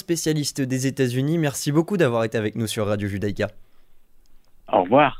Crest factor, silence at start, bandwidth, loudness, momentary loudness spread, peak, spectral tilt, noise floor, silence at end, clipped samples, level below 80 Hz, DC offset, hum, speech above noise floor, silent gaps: 20 dB; 0.1 s; 16 kHz; -23 LUFS; 6 LU; -4 dBFS; -5.5 dB/octave; -48 dBFS; 0 s; under 0.1%; -50 dBFS; under 0.1%; none; 26 dB; none